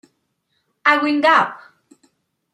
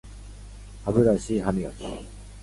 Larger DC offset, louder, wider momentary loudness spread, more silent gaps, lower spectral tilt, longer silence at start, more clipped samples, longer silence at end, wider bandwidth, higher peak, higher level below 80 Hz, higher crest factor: neither; first, -16 LUFS vs -25 LUFS; second, 6 LU vs 24 LU; neither; second, -4 dB/octave vs -7 dB/octave; first, 0.85 s vs 0.05 s; neither; first, 0.95 s vs 0 s; about the same, 12.5 kHz vs 11.5 kHz; first, -2 dBFS vs -6 dBFS; second, -76 dBFS vs -42 dBFS; about the same, 20 dB vs 20 dB